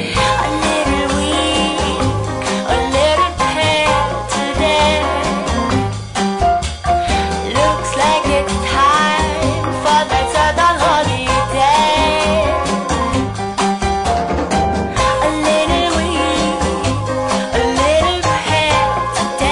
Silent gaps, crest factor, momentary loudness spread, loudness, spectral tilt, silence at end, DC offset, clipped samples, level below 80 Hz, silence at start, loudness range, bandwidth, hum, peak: none; 12 dB; 5 LU; -15 LUFS; -4 dB/octave; 0 s; under 0.1%; under 0.1%; -28 dBFS; 0 s; 2 LU; 11 kHz; none; -4 dBFS